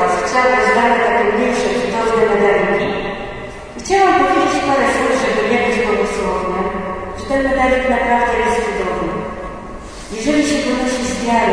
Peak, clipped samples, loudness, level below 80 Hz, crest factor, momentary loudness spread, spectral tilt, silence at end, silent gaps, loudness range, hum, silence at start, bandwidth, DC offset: -2 dBFS; under 0.1%; -15 LUFS; -36 dBFS; 14 dB; 13 LU; -4.5 dB/octave; 0 s; none; 3 LU; none; 0 s; 10.5 kHz; under 0.1%